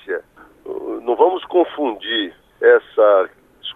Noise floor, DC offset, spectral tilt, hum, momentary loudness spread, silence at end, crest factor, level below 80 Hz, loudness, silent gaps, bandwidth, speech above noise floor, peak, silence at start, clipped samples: -42 dBFS; under 0.1%; -5 dB/octave; none; 15 LU; 0.05 s; 16 dB; -62 dBFS; -17 LUFS; none; 3.9 kHz; 26 dB; -2 dBFS; 0.05 s; under 0.1%